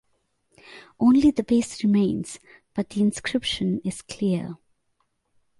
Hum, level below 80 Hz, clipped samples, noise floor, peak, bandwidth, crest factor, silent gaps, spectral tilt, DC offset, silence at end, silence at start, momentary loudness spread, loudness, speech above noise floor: none; -54 dBFS; under 0.1%; -72 dBFS; -8 dBFS; 11.5 kHz; 16 dB; none; -5.5 dB/octave; under 0.1%; 1.05 s; 0.7 s; 14 LU; -23 LUFS; 49 dB